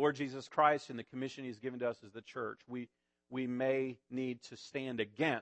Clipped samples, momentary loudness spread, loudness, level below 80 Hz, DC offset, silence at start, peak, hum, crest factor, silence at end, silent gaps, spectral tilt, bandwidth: under 0.1%; 15 LU; -38 LUFS; -84 dBFS; under 0.1%; 0 s; -14 dBFS; none; 22 dB; 0 s; none; -6 dB/octave; 8.4 kHz